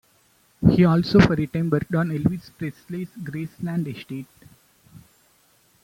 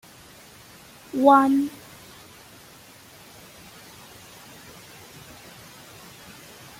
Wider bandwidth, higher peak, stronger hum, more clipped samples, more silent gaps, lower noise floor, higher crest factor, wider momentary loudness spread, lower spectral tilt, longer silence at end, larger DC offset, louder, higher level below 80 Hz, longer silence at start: about the same, 16 kHz vs 16.5 kHz; about the same, -2 dBFS vs -4 dBFS; neither; neither; neither; first, -61 dBFS vs -48 dBFS; about the same, 20 dB vs 24 dB; second, 17 LU vs 28 LU; first, -8 dB/octave vs -5 dB/octave; second, 0.85 s vs 5.1 s; neither; about the same, -22 LUFS vs -20 LUFS; first, -44 dBFS vs -64 dBFS; second, 0.6 s vs 1.15 s